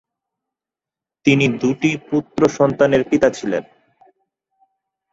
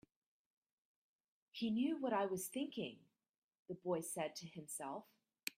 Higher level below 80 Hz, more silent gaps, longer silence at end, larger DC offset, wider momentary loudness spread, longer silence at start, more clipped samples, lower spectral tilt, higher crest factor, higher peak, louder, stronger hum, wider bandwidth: first, -54 dBFS vs -86 dBFS; second, none vs 3.38-3.49 s, 3.59-3.65 s, 5.43-5.47 s; first, 1.5 s vs 0.1 s; neither; second, 8 LU vs 12 LU; second, 1.25 s vs 1.55 s; neither; first, -6 dB/octave vs -4 dB/octave; about the same, 18 dB vs 22 dB; first, -2 dBFS vs -22 dBFS; first, -17 LUFS vs -43 LUFS; neither; second, 8 kHz vs 16 kHz